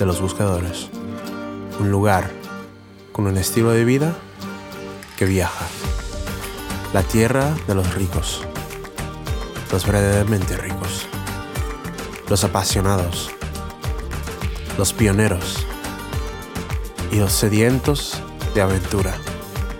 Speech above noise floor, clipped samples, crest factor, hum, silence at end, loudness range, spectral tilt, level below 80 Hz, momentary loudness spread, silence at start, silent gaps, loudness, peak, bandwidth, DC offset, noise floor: 23 dB; under 0.1%; 18 dB; none; 0 s; 2 LU; -5 dB/octave; -32 dBFS; 13 LU; 0 s; none; -21 LUFS; -4 dBFS; 19 kHz; under 0.1%; -41 dBFS